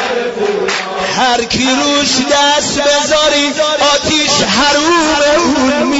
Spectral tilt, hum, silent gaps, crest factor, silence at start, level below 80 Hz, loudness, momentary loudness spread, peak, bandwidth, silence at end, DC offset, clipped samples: -2 dB/octave; none; none; 12 dB; 0 s; -40 dBFS; -11 LUFS; 6 LU; 0 dBFS; 8 kHz; 0 s; under 0.1%; under 0.1%